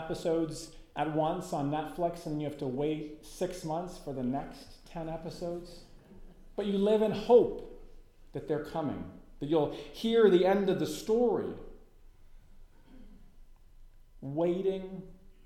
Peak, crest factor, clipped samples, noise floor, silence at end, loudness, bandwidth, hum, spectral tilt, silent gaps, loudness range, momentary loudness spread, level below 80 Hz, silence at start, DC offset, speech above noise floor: -12 dBFS; 22 dB; under 0.1%; -54 dBFS; 0.15 s; -31 LUFS; 15 kHz; none; -6.5 dB/octave; none; 9 LU; 20 LU; -54 dBFS; 0 s; under 0.1%; 24 dB